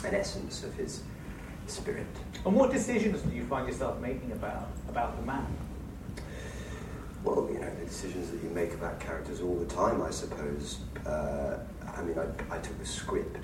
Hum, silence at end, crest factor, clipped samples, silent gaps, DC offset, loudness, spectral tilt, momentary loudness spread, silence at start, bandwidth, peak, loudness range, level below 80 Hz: none; 0 s; 22 dB; under 0.1%; none; under 0.1%; -34 LUFS; -5.5 dB/octave; 12 LU; 0 s; 16.5 kHz; -12 dBFS; 5 LU; -44 dBFS